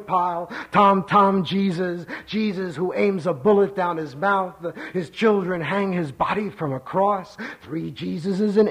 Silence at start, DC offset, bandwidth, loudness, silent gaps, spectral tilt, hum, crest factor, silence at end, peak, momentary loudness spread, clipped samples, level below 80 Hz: 0 s; under 0.1%; 10.5 kHz; -22 LUFS; none; -7.5 dB/octave; none; 16 dB; 0 s; -6 dBFS; 12 LU; under 0.1%; -60 dBFS